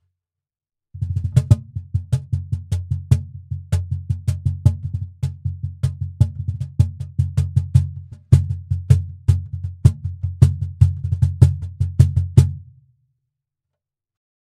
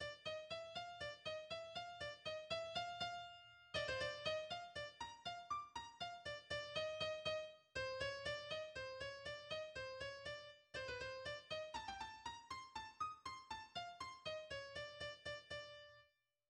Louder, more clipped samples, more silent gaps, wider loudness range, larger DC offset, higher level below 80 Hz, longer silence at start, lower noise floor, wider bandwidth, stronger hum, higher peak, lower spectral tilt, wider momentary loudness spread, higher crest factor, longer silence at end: first, -20 LUFS vs -48 LUFS; neither; neither; about the same, 5 LU vs 4 LU; neither; first, -34 dBFS vs -72 dBFS; first, 0.95 s vs 0 s; first, -89 dBFS vs -76 dBFS; about the same, 10.5 kHz vs 11 kHz; neither; first, 0 dBFS vs -30 dBFS; first, -8.5 dB/octave vs -2.5 dB/octave; first, 11 LU vs 8 LU; about the same, 20 dB vs 18 dB; first, 1.85 s vs 0.45 s